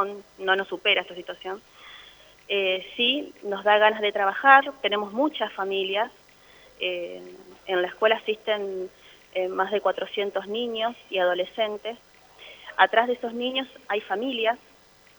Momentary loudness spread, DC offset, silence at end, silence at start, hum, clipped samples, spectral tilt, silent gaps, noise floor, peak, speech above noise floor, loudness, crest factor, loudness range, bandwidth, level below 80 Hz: 17 LU; under 0.1%; 0.6 s; 0 s; none; under 0.1%; -4 dB/octave; none; -53 dBFS; -2 dBFS; 28 dB; -25 LUFS; 24 dB; 6 LU; over 20 kHz; -70 dBFS